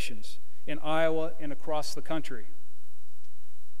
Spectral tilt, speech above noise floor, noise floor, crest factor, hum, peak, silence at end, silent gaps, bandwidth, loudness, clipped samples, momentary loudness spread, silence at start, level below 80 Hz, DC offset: -5 dB/octave; 31 dB; -64 dBFS; 22 dB; none; -12 dBFS; 1.35 s; none; 15.5 kHz; -33 LUFS; under 0.1%; 19 LU; 0 s; -66 dBFS; 10%